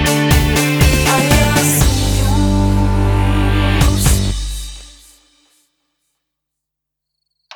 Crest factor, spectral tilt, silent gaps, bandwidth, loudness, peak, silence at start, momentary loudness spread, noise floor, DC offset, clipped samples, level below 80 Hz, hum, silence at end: 14 dB; -4.5 dB/octave; none; over 20 kHz; -13 LUFS; 0 dBFS; 0 s; 7 LU; -79 dBFS; under 0.1%; under 0.1%; -20 dBFS; none; 2.65 s